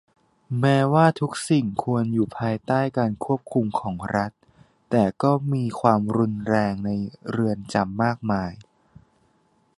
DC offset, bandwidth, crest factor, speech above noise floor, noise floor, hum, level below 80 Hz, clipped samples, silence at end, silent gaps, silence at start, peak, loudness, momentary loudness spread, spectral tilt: under 0.1%; 11.5 kHz; 20 dB; 42 dB; -64 dBFS; none; -54 dBFS; under 0.1%; 1.15 s; none; 0.5 s; -2 dBFS; -23 LUFS; 8 LU; -7 dB/octave